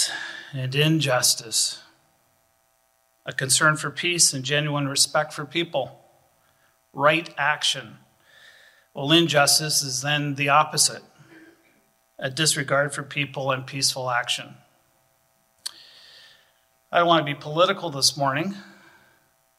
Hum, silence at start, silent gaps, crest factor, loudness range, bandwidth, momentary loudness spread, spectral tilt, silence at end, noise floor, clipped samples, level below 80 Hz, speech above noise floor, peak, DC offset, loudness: none; 0 s; none; 22 dB; 6 LU; 16 kHz; 15 LU; -2.5 dB/octave; 0.95 s; -66 dBFS; under 0.1%; -70 dBFS; 43 dB; -4 dBFS; under 0.1%; -22 LUFS